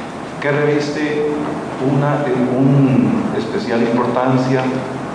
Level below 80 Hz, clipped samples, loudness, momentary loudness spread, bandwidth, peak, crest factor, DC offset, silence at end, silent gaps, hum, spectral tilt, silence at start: -52 dBFS; under 0.1%; -17 LUFS; 8 LU; 10.5 kHz; -2 dBFS; 14 dB; under 0.1%; 0 s; none; none; -7.5 dB/octave; 0 s